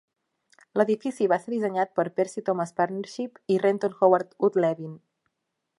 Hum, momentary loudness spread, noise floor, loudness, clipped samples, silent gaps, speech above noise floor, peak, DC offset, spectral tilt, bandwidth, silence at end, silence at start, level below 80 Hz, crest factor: none; 10 LU; -81 dBFS; -26 LUFS; under 0.1%; none; 56 dB; -6 dBFS; under 0.1%; -6.5 dB/octave; 11.5 kHz; 0.8 s; 0.75 s; -80 dBFS; 20 dB